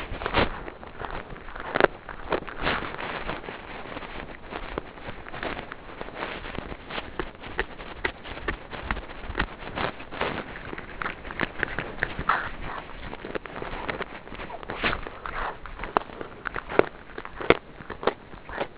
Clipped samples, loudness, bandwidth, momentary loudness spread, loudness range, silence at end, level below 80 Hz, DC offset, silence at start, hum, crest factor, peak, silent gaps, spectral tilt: under 0.1%; -31 LUFS; 4 kHz; 13 LU; 7 LU; 0 s; -44 dBFS; 0.2%; 0 s; none; 30 dB; 0 dBFS; none; -2.5 dB/octave